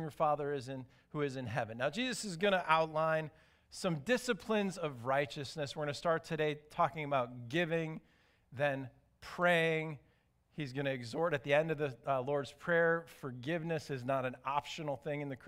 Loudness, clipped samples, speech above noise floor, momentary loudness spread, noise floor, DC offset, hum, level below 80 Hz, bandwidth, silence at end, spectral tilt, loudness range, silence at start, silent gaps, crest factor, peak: -36 LUFS; under 0.1%; 36 dB; 13 LU; -72 dBFS; under 0.1%; none; -70 dBFS; 16 kHz; 0 s; -5 dB/octave; 2 LU; 0 s; none; 22 dB; -14 dBFS